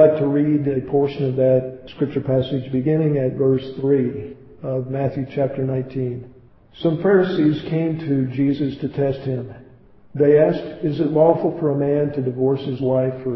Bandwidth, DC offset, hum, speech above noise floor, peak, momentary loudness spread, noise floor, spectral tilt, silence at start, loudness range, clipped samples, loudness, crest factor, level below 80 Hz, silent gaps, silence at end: 5.8 kHz; under 0.1%; none; 28 dB; -2 dBFS; 10 LU; -47 dBFS; -11 dB/octave; 0 s; 3 LU; under 0.1%; -20 LUFS; 18 dB; -52 dBFS; none; 0 s